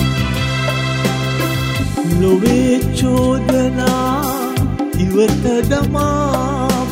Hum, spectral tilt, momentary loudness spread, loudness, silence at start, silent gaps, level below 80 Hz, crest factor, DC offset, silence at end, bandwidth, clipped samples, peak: none; -6 dB/octave; 5 LU; -16 LUFS; 0 s; none; -28 dBFS; 14 dB; under 0.1%; 0 s; 16.5 kHz; under 0.1%; 0 dBFS